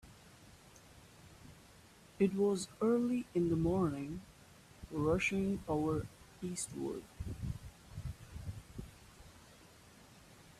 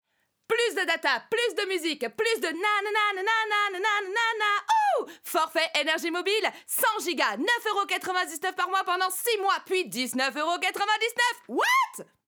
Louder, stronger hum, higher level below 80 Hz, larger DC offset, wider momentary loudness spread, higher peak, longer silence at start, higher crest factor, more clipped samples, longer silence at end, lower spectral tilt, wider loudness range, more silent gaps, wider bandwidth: second, -37 LUFS vs -26 LUFS; neither; first, -56 dBFS vs -84 dBFS; neither; first, 26 LU vs 4 LU; second, -20 dBFS vs -10 dBFS; second, 0.05 s vs 0.5 s; about the same, 18 dB vs 16 dB; neither; about the same, 0.2 s vs 0.25 s; first, -6 dB/octave vs -0.5 dB/octave; first, 12 LU vs 2 LU; neither; second, 14.5 kHz vs over 20 kHz